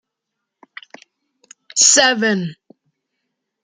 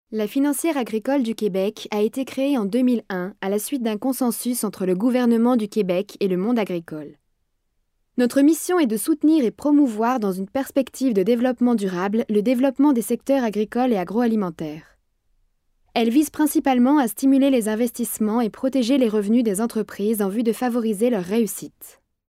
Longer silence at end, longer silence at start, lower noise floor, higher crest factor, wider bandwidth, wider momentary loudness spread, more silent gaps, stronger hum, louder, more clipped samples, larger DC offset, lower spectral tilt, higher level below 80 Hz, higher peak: first, 1.1 s vs 0.4 s; first, 1.75 s vs 0.1 s; first, -79 dBFS vs -70 dBFS; first, 20 dB vs 14 dB; second, 14 kHz vs 16 kHz; first, 14 LU vs 7 LU; neither; neither; first, -13 LUFS vs -21 LUFS; neither; neither; second, -1 dB/octave vs -5.5 dB/octave; second, -72 dBFS vs -62 dBFS; first, 0 dBFS vs -8 dBFS